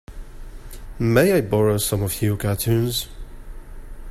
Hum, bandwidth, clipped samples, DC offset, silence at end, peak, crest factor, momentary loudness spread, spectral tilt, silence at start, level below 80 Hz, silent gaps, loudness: none; 15.5 kHz; under 0.1%; under 0.1%; 0 s; -2 dBFS; 20 dB; 24 LU; -5.5 dB/octave; 0.1 s; -36 dBFS; none; -20 LUFS